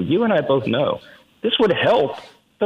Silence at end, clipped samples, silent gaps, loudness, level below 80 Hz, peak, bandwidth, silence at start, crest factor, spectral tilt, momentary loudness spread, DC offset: 0 s; under 0.1%; none; -19 LUFS; -56 dBFS; -6 dBFS; 10 kHz; 0 s; 14 dB; -7 dB/octave; 10 LU; under 0.1%